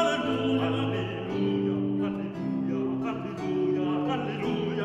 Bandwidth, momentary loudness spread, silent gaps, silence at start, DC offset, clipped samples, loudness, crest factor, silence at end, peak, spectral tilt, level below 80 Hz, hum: 8.4 kHz; 5 LU; none; 0 s; under 0.1%; under 0.1%; -29 LUFS; 16 dB; 0 s; -12 dBFS; -7 dB/octave; -62 dBFS; none